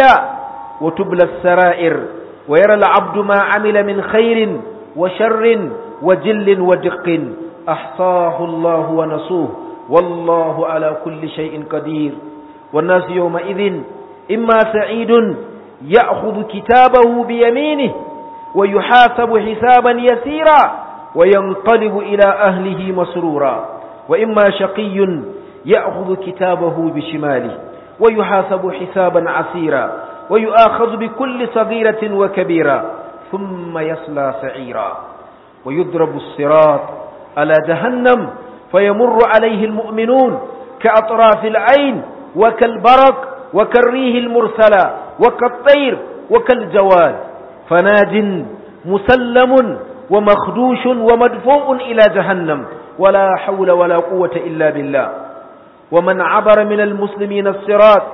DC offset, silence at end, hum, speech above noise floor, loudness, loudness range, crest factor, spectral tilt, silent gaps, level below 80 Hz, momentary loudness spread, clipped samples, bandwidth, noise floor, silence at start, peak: under 0.1%; 0 s; none; 27 dB; -13 LUFS; 6 LU; 12 dB; -8 dB/octave; none; -50 dBFS; 14 LU; under 0.1%; 6 kHz; -39 dBFS; 0 s; 0 dBFS